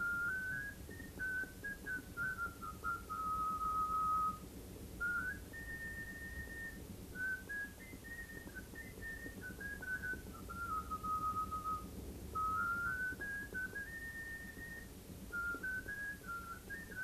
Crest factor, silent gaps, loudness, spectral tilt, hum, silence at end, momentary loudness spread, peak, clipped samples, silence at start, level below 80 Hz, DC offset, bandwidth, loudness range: 14 dB; none; -42 LUFS; -4 dB/octave; none; 0 s; 12 LU; -30 dBFS; under 0.1%; 0 s; -56 dBFS; under 0.1%; 14 kHz; 6 LU